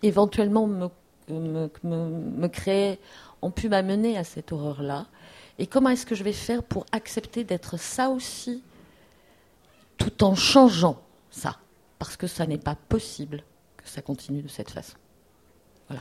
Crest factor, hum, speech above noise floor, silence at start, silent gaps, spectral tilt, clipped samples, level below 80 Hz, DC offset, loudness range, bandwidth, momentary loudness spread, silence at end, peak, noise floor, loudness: 24 dB; none; 35 dB; 0 s; none; -5.5 dB/octave; under 0.1%; -50 dBFS; under 0.1%; 9 LU; 15 kHz; 17 LU; 0 s; -2 dBFS; -60 dBFS; -26 LUFS